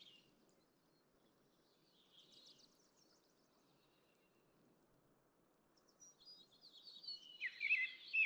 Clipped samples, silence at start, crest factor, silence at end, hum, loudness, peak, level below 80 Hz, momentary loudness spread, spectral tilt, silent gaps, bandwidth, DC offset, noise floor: under 0.1%; 0.05 s; 22 dB; 0 s; none; -42 LUFS; -28 dBFS; under -90 dBFS; 27 LU; 0 dB/octave; none; over 20 kHz; under 0.1%; -77 dBFS